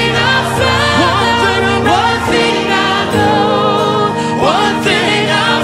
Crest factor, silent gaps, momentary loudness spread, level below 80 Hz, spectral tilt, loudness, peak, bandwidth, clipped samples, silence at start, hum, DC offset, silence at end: 12 dB; none; 2 LU; -38 dBFS; -4.5 dB/octave; -11 LUFS; 0 dBFS; 16 kHz; under 0.1%; 0 s; none; under 0.1%; 0 s